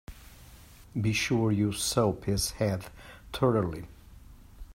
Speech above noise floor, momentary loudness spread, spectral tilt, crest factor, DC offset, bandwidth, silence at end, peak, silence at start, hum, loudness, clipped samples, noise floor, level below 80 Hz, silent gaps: 23 dB; 19 LU; -5 dB/octave; 20 dB; under 0.1%; 16 kHz; 0 s; -12 dBFS; 0.1 s; none; -29 LUFS; under 0.1%; -52 dBFS; -48 dBFS; none